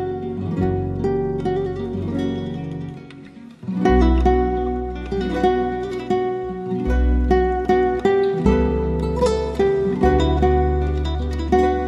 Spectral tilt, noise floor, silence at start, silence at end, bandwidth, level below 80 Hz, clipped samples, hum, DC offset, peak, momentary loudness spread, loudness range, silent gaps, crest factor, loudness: -8 dB/octave; -40 dBFS; 0 s; 0 s; 10.5 kHz; -26 dBFS; under 0.1%; none; under 0.1%; -2 dBFS; 9 LU; 5 LU; none; 16 dB; -20 LUFS